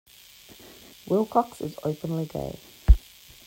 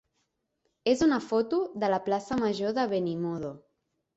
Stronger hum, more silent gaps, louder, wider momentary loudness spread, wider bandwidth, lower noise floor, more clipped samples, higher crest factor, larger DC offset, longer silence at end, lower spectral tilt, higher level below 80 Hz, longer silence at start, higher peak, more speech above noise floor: neither; neither; about the same, -27 LUFS vs -28 LUFS; first, 24 LU vs 8 LU; first, 16.5 kHz vs 8.2 kHz; second, -51 dBFS vs -78 dBFS; neither; first, 22 dB vs 16 dB; neither; about the same, 0.5 s vs 0.6 s; first, -7.5 dB/octave vs -6 dB/octave; first, -28 dBFS vs -62 dBFS; first, 1.05 s vs 0.85 s; first, -4 dBFS vs -12 dBFS; second, 23 dB vs 50 dB